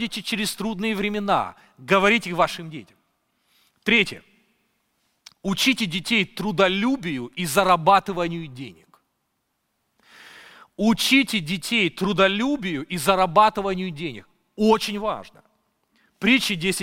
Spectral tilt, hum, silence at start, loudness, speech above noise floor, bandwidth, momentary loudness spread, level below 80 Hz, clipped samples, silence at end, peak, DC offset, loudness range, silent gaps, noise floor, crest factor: -4 dB/octave; none; 0 s; -21 LUFS; 52 dB; 17 kHz; 16 LU; -52 dBFS; under 0.1%; 0 s; -2 dBFS; under 0.1%; 4 LU; none; -74 dBFS; 22 dB